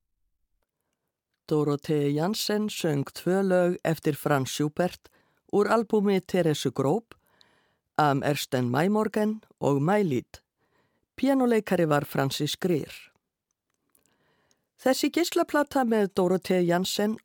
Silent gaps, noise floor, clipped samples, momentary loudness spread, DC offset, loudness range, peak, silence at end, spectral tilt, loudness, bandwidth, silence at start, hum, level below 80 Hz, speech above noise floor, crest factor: none; -83 dBFS; under 0.1%; 6 LU; under 0.1%; 3 LU; -8 dBFS; 0.05 s; -5.5 dB/octave; -26 LUFS; 19.5 kHz; 1.5 s; none; -66 dBFS; 58 dB; 18 dB